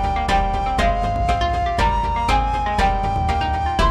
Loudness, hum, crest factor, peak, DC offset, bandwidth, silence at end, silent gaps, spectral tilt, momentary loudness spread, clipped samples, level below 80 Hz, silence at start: -20 LUFS; none; 14 dB; -6 dBFS; under 0.1%; 12.5 kHz; 0 s; none; -5.5 dB/octave; 2 LU; under 0.1%; -24 dBFS; 0 s